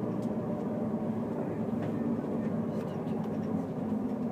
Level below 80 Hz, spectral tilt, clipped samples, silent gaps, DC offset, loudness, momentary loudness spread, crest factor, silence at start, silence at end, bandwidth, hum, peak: -64 dBFS; -9.5 dB/octave; under 0.1%; none; under 0.1%; -34 LUFS; 2 LU; 12 dB; 0 s; 0 s; 9.4 kHz; none; -20 dBFS